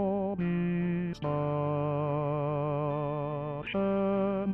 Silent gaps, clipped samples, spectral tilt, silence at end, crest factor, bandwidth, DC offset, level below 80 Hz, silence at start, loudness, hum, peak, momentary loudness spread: none; under 0.1%; -10 dB/octave; 0 s; 10 dB; 6 kHz; under 0.1%; -56 dBFS; 0 s; -31 LUFS; none; -20 dBFS; 4 LU